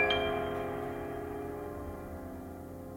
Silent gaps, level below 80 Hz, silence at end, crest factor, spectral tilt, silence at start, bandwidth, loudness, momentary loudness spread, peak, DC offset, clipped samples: none; -52 dBFS; 0 s; 20 dB; -5.5 dB/octave; 0 s; 17.5 kHz; -37 LUFS; 13 LU; -16 dBFS; under 0.1%; under 0.1%